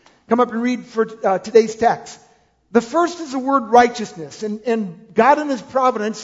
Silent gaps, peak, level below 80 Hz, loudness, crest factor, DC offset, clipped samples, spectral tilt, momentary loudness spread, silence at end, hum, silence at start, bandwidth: none; 0 dBFS; -58 dBFS; -18 LUFS; 18 dB; under 0.1%; under 0.1%; -5 dB/octave; 12 LU; 0 s; none; 0.3 s; 7.8 kHz